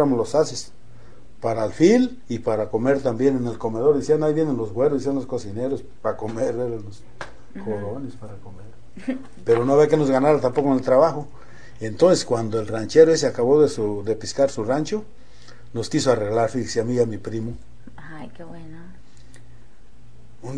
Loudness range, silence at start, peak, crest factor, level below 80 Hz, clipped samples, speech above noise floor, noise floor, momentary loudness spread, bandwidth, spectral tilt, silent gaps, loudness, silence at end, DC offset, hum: 10 LU; 0 s; -2 dBFS; 20 dB; -52 dBFS; under 0.1%; 29 dB; -50 dBFS; 22 LU; 10 kHz; -6 dB/octave; none; -21 LUFS; 0 s; 2%; none